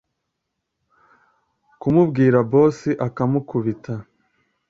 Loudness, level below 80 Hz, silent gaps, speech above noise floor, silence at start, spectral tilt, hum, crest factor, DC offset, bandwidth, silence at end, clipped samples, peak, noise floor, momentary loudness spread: -19 LUFS; -56 dBFS; none; 60 dB; 1.85 s; -9.5 dB/octave; none; 18 dB; under 0.1%; 7.8 kHz; 0.65 s; under 0.1%; -4 dBFS; -78 dBFS; 14 LU